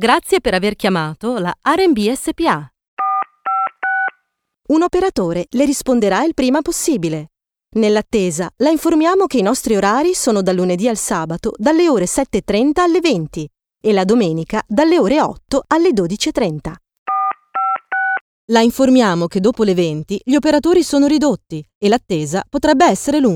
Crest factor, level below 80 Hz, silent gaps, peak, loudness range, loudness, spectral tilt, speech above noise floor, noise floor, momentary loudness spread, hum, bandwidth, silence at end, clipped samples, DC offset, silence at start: 16 dB; -44 dBFS; 2.88-2.97 s, 16.99-17.06 s, 18.21-18.48 s, 21.75-21.81 s; 0 dBFS; 3 LU; -16 LUFS; -5 dB/octave; 53 dB; -68 dBFS; 8 LU; none; 18 kHz; 0 s; under 0.1%; under 0.1%; 0 s